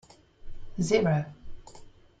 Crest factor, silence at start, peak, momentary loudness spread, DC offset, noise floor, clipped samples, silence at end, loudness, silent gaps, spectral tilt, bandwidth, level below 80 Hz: 20 dB; 0.45 s; -10 dBFS; 26 LU; under 0.1%; -50 dBFS; under 0.1%; 0.3 s; -27 LUFS; none; -6 dB/octave; 9.2 kHz; -48 dBFS